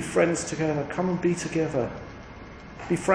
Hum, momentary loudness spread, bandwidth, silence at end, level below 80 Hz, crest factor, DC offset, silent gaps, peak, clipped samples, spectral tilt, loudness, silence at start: none; 19 LU; 10.5 kHz; 0 s; -50 dBFS; 20 dB; under 0.1%; none; -8 dBFS; under 0.1%; -5.5 dB/octave; -27 LUFS; 0 s